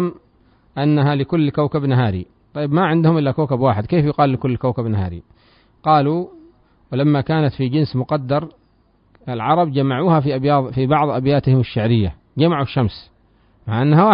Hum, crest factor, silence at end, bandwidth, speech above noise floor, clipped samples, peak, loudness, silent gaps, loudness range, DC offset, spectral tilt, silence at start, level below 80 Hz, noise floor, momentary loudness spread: none; 16 dB; 0 s; 5.4 kHz; 41 dB; under 0.1%; -2 dBFS; -18 LUFS; none; 3 LU; under 0.1%; -13 dB/octave; 0 s; -46 dBFS; -57 dBFS; 10 LU